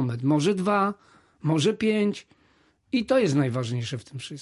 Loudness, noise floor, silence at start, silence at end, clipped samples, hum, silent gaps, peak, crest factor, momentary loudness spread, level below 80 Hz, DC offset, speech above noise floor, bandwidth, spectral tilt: -25 LUFS; -63 dBFS; 0 s; 0 s; under 0.1%; none; none; -10 dBFS; 14 dB; 12 LU; -62 dBFS; under 0.1%; 39 dB; 11.5 kHz; -6 dB/octave